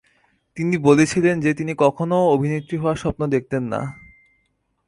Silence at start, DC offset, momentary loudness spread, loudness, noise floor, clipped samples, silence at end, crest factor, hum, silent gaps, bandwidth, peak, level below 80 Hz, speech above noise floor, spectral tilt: 0.55 s; under 0.1%; 11 LU; -20 LUFS; -69 dBFS; under 0.1%; 0.95 s; 18 dB; none; none; 11.5 kHz; -2 dBFS; -48 dBFS; 50 dB; -6.5 dB/octave